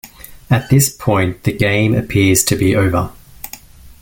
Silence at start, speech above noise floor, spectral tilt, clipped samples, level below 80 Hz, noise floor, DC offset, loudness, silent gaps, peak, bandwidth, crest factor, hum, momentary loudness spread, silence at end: 0.05 s; 23 dB; -5 dB/octave; under 0.1%; -38 dBFS; -37 dBFS; under 0.1%; -14 LUFS; none; 0 dBFS; 17 kHz; 16 dB; none; 19 LU; 0.1 s